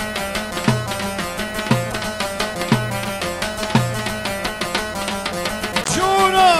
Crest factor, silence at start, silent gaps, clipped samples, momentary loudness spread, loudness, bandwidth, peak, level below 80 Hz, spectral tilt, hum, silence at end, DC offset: 18 dB; 0 s; none; under 0.1%; 6 LU; -21 LUFS; 16 kHz; -2 dBFS; -40 dBFS; -4 dB/octave; none; 0 s; under 0.1%